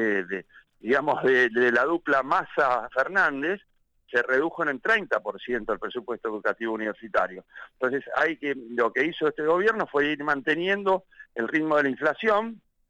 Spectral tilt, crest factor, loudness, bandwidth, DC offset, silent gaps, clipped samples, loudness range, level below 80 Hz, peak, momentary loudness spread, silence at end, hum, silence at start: -5.5 dB/octave; 14 dB; -25 LUFS; 9.2 kHz; under 0.1%; none; under 0.1%; 5 LU; -62 dBFS; -12 dBFS; 9 LU; 0.3 s; none; 0 s